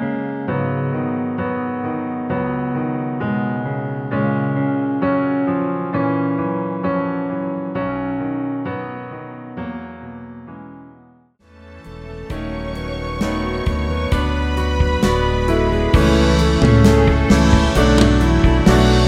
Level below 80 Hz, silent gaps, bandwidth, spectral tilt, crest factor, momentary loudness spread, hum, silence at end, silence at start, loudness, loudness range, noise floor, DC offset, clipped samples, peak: -24 dBFS; none; 14 kHz; -6.5 dB/octave; 18 dB; 17 LU; none; 0 s; 0 s; -18 LUFS; 17 LU; -50 dBFS; under 0.1%; under 0.1%; 0 dBFS